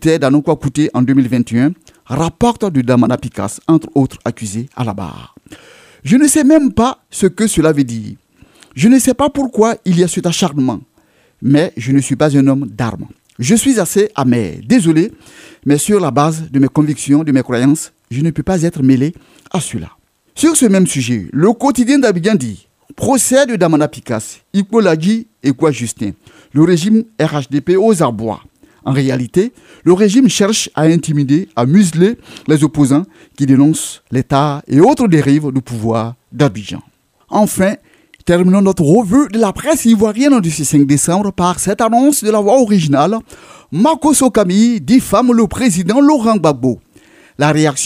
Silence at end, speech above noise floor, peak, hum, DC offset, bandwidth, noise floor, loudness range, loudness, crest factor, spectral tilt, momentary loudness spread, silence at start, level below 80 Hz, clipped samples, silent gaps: 0 s; 41 dB; 0 dBFS; none; under 0.1%; 16 kHz; -53 dBFS; 3 LU; -13 LUFS; 12 dB; -5.5 dB/octave; 11 LU; 0 s; -44 dBFS; under 0.1%; none